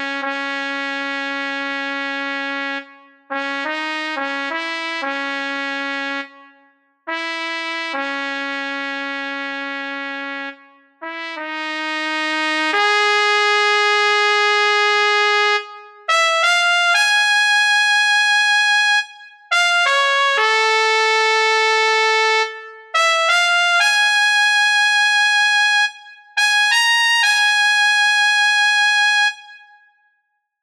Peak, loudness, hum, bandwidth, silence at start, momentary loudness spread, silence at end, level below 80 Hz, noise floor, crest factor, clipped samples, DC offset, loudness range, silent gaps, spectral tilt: -2 dBFS; -16 LUFS; none; 15 kHz; 0 s; 12 LU; 1.05 s; -72 dBFS; -69 dBFS; 16 dB; under 0.1%; under 0.1%; 10 LU; none; 2 dB/octave